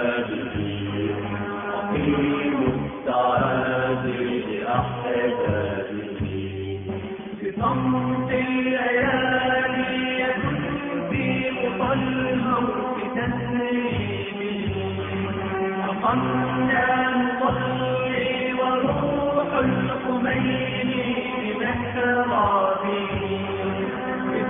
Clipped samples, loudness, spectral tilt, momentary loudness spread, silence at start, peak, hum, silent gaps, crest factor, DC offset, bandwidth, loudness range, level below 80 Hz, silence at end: under 0.1%; -24 LUFS; -10.5 dB/octave; 7 LU; 0 s; -8 dBFS; none; none; 16 dB; under 0.1%; 3.8 kHz; 4 LU; -48 dBFS; 0 s